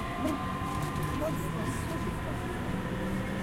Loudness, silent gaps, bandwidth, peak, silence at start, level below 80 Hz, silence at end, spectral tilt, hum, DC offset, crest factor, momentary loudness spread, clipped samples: -33 LUFS; none; 16 kHz; -18 dBFS; 0 s; -44 dBFS; 0 s; -6 dB/octave; none; under 0.1%; 14 dB; 2 LU; under 0.1%